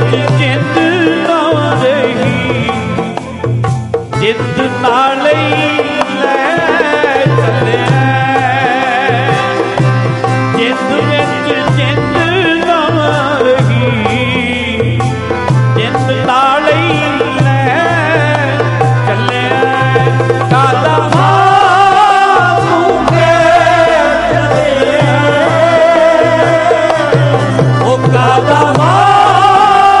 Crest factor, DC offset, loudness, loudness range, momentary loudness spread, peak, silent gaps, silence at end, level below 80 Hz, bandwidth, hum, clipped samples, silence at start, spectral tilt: 10 dB; under 0.1%; -10 LUFS; 4 LU; 6 LU; 0 dBFS; none; 0 s; -38 dBFS; 11.5 kHz; none; under 0.1%; 0 s; -6 dB/octave